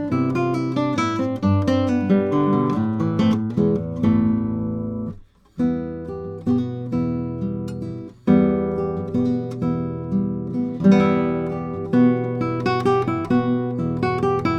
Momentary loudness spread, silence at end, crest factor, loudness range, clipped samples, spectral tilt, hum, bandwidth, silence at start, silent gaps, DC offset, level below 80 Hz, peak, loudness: 10 LU; 0 s; 18 dB; 4 LU; under 0.1%; -8.5 dB/octave; none; 8.6 kHz; 0 s; none; under 0.1%; -50 dBFS; -4 dBFS; -21 LUFS